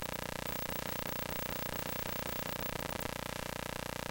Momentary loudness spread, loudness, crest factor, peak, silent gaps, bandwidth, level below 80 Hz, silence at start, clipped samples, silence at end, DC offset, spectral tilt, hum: 3 LU; -38 LUFS; 20 dB; -18 dBFS; none; 17 kHz; -54 dBFS; 0 s; under 0.1%; 0 s; under 0.1%; -3.5 dB/octave; 60 Hz at -50 dBFS